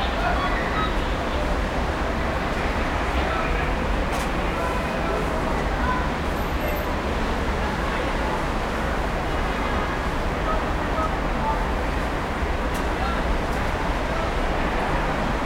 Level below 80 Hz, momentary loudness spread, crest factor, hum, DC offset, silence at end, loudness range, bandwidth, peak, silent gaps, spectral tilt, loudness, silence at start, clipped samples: -28 dBFS; 2 LU; 14 dB; none; under 0.1%; 0 s; 1 LU; 16.5 kHz; -10 dBFS; none; -5.5 dB/octave; -25 LUFS; 0 s; under 0.1%